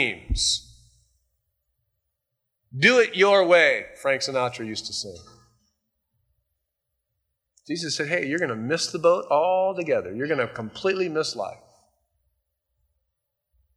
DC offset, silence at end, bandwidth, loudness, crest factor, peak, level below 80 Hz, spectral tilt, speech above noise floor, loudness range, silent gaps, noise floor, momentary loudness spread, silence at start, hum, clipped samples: under 0.1%; 2.2 s; 12.5 kHz; -23 LUFS; 22 dB; -4 dBFS; -46 dBFS; -3.5 dB/octave; 58 dB; 11 LU; none; -81 dBFS; 14 LU; 0 s; none; under 0.1%